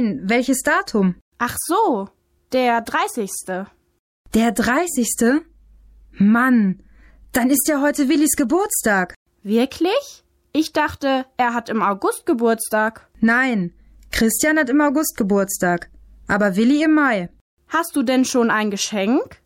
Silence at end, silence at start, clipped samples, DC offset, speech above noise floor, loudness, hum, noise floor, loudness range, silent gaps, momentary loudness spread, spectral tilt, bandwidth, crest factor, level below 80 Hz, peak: 0.1 s; 0 s; under 0.1%; under 0.1%; 30 dB; -19 LUFS; none; -48 dBFS; 3 LU; 1.21-1.32 s, 3.99-4.25 s, 9.16-9.26 s, 17.41-17.57 s; 9 LU; -4 dB/octave; 17 kHz; 12 dB; -48 dBFS; -6 dBFS